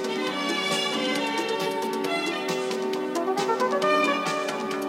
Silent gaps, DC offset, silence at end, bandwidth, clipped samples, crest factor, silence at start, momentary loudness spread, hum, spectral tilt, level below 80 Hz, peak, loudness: none; under 0.1%; 0 s; 16.5 kHz; under 0.1%; 16 dB; 0 s; 5 LU; none; -3 dB/octave; -86 dBFS; -10 dBFS; -25 LUFS